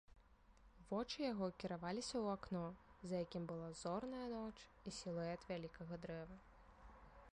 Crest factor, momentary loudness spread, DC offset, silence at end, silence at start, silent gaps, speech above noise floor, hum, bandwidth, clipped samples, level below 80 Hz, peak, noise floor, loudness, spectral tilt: 16 dB; 18 LU; under 0.1%; 0.05 s; 0.1 s; none; 22 dB; none; 11 kHz; under 0.1%; -68 dBFS; -32 dBFS; -69 dBFS; -48 LUFS; -5.5 dB/octave